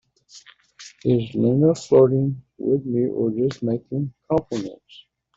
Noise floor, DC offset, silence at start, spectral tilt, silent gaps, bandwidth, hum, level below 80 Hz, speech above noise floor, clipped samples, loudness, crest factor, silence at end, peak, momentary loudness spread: -49 dBFS; under 0.1%; 0.35 s; -8 dB/octave; none; 8 kHz; none; -58 dBFS; 29 dB; under 0.1%; -21 LUFS; 18 dB; 0.6 s; -4 dBFS; 12 LU